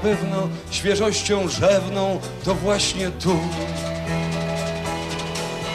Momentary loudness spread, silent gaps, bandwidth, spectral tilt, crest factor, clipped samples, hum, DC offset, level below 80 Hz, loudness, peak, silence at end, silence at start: 8 LU; none; 14 kHz; -4.5 dB/octave; 16 dB; under 0.1%; none; under 0.1%; -42 dBFS; -22 LUFS; -8 dBFS; 0 s; 0 s